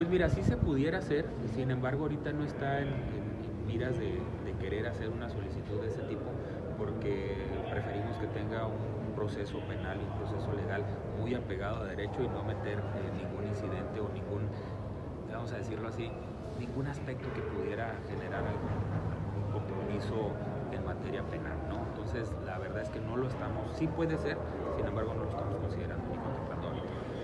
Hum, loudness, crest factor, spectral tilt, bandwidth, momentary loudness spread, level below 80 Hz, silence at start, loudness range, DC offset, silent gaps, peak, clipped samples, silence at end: none; -36 LUFS; 20 dB; -8 dB/octave; 10.5 kHz; 5 LU; -48 dBFS; 0 s; 3 LU; under 0.1%; none; -16 dBFS; under 0.1%; 0 s